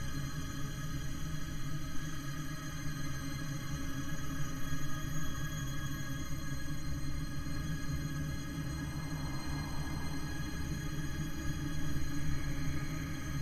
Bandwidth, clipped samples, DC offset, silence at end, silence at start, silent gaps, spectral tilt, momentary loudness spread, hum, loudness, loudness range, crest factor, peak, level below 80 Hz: 14.5 kHz; under 0.1%; under 0.1%; 0 s; 0 s; none; -5 dB/octave; 3 LU; none; -40 LUFS; 2 LU; 16 dB; -20 dBFS; -42 dBFS